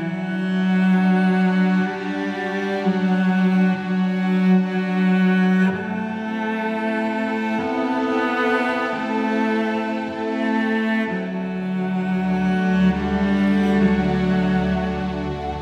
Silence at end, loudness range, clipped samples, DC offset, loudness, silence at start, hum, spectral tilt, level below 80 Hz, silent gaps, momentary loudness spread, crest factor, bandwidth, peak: 0 s; 3 LU; under 0.1%; under 0.1%; -20 LUFS; 0 s; none; -8 dB/octave; -44 dBFS; none; 8 LU; 14 dB; 6.6 kHz; -6 dBFS